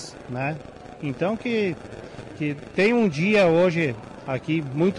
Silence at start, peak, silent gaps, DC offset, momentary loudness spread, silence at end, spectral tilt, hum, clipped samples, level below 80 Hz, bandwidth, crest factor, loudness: 0 s; -12 dBFS; none; under 0.1%; 18 LU; 0 s; -6.5 dB/octave; none; under 0.1%; -56 dBFS; 11 kHz; 12 dB; -23 LUFS